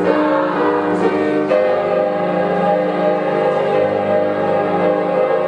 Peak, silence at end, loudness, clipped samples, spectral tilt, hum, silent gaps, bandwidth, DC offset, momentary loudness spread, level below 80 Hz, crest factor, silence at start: -2 dBFS; 0 s; -16 LUFS; under 0.1%; -7.5 dB/octave; 50 Hz at -50 dBFS; none; 9.2 kHz; under 0.1%; 2 LU; -60 dBFS; 14 dB; 0 s